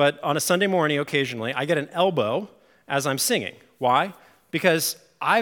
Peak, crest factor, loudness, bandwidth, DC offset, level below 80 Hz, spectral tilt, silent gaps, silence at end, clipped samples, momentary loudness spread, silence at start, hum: -4 dBFS; 20 dB; -23 LUFS; 18 kHz; under 0.1%; -76 dBFS; -3.5 dB/octave; none; 0 s; under 0.1%; 8 LU; 0 s; none